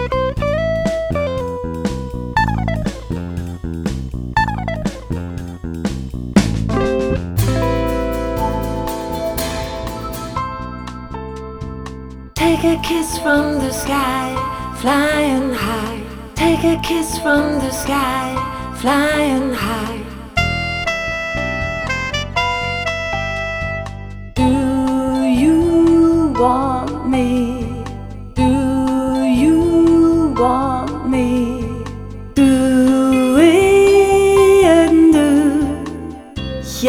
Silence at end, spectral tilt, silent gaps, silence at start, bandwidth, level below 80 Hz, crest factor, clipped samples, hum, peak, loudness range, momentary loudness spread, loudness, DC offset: 0 s; -5.5 dB/octave; none; 0 s; over 20 kHz; -30 dBFS; 16 dB; under 0.1%; none; 0 dBFS; 9 LU; 15 LU; -16 LUFS; under 0.1%